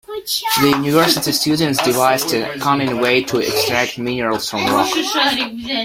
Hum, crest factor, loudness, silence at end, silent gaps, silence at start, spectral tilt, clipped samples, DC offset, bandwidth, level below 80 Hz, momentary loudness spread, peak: none; 16 dB; -16 LUFS; 0 s; none; 0.1 s; -3.5 dB/octave; under 0.1%; under 0.1%; 16.5 kHz; -52 dBFS; 6 LU; -2 dBFS